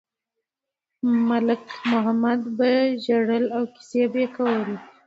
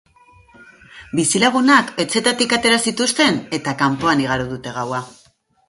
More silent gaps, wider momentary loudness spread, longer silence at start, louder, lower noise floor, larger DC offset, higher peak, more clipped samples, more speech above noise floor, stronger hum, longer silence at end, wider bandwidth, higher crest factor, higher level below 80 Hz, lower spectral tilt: neither; second, 6 LU vs 11 LU; first, 1.05 s vs 0.6 s; second, -23 LUFS vs -17 LUFS; first, -87 dBFS vs -50 dBFS; neither; second, -8 dBFS vs 0 dBFS; neither; first, 65 dB vs 32 dB; neither; second, 0.2 s vs 0.55 s; second, 7.6 kHz vs 11.5 kHz; about the same, 14 dB vs 18 dB; second, -74 dBFS vs -52 dBFS; first, -6.5 dB/octave vs -3 dB/octave